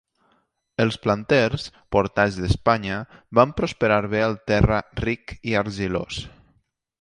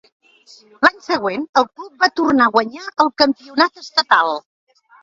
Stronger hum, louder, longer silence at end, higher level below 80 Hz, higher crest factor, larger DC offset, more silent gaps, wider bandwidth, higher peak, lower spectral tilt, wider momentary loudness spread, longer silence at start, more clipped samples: neither; second, -22 LUFS vs -17 LUFS; about the same, 0.7 s vs 0.65 s; first, -38 dBFS vs -60 dBFS; about the same, 22 dB vs 18 dB; neither; second, none vs 1.49-1.53 s; first, 11 kHz vs 7.8 kHz; about the same, 0 dBFS vs 0 dBFS; first, -6.5 dB/octave vs -3.5 dB/octave; first, 10 LU vs 7 LU; about the same, 0.8 s vs 0.8 s; neither